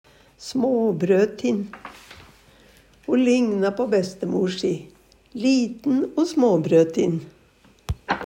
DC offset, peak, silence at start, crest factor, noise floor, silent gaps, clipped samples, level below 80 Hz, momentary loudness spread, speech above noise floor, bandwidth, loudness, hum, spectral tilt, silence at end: under 0.1%; -6 dBFS; 0.4 s; 16 dB; -55 dBFS; none; under 0.1%; -50 dBFS; 16 LU; 35 dB; 15.5 kHz; -22 LUFS; none; -6.5 dB/octave; 0 s